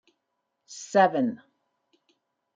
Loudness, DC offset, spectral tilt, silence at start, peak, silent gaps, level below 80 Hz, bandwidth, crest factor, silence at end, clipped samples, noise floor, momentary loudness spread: -24 LUFS; under 0.1%; -5 dB/octave; 0.7 s; -6 dBFS; none; -84 dBFS; 9.2 kHz; 22 dB; 1.2 s; under 0.1%; -80 dBFS; 23 LU